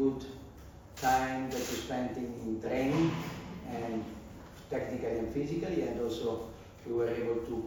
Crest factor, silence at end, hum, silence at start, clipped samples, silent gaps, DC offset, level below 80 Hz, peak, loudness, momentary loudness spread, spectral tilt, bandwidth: 18 dB; 0 s; none; 0 s; under 0.1%; none; under 0.1%; -54 dBFS; -16 dBFS; -34 LUFS; 18 LU; -5.5 dB/octave; 19.5 kHz